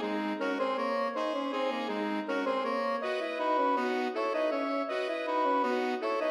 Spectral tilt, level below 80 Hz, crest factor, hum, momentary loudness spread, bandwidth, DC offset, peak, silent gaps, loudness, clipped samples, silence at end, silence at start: -5 dB/octave; -88 dBFS; 12 dB; none; 4 LU; 12.5 kHz; under 0.1%; -18 dBFS; none; -31 LUFS; under 0.1%; 0 s; 0 s